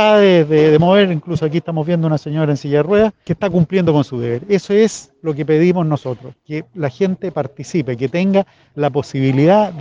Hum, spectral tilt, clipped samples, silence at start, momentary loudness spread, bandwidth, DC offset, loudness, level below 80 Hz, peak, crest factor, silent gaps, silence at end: none; -7 dB/octave; under 0.1%; 0 s; 12 LU; 9.4 kHz; under 0.1%; -15 LUFS; -52 dBFS; 0 dBFS; 14 dB; none; 0 s